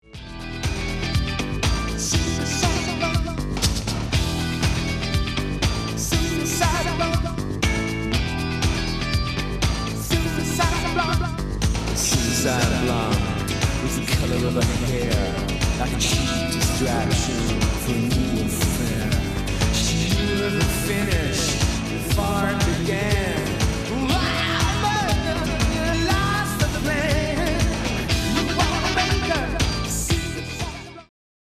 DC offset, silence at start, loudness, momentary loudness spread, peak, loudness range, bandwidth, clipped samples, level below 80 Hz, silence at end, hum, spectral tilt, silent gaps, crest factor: under 0.1%; 0.15 s; -22 LUFS; 4 LU; -6 dBFS; 2 LU; 15 kHz; under 0.1%; -30 dBFS; 0.5 s; none; -4.5 dB/octave; none; 18 dB